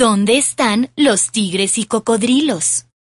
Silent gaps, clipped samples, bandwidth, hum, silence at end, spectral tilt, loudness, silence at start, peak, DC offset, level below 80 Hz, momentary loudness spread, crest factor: none; under 0.1%; 11.5 kHz; none; 0.35 s; -3 dB/octave; -15 LUFS; 0 s; -2 dBFS; under 0.1%; -56 dBFS; 4 LU; 12 dB